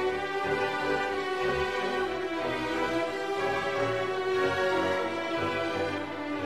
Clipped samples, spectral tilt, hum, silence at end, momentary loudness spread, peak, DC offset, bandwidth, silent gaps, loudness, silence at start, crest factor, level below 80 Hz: under 0.1%; -5 dB/octave; none; 0 s; 4 LU; -14 dBFS; 0.2%; 14 kHz; none; -29 LUFS; 0 s; 14 dB; -56 dBFS